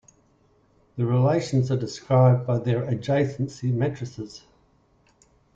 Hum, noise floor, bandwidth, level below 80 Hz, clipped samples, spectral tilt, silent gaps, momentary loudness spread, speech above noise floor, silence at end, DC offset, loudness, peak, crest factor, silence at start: none; -62 dBFS; 7.6 kHz; -58 dBFS; under 0.1%; -8 dB/octave; none; 16 LU; 39 dB; 1.15 s; under 0.1%; -24 LUFS; -8 dBFS; 18 dB; 0.95 s